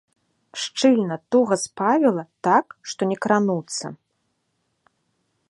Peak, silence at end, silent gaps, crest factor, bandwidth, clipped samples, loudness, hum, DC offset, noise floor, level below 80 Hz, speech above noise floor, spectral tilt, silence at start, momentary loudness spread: -4 dBFS; 1.55 s; none; 20 dB; 11.5 kHz; under 0.1%; -21 LUFS; none; under 0.1%; -73 dBFS; -72 dBFS; 52 dB; -4.5 dB/octave; 0.55 s; 12 LU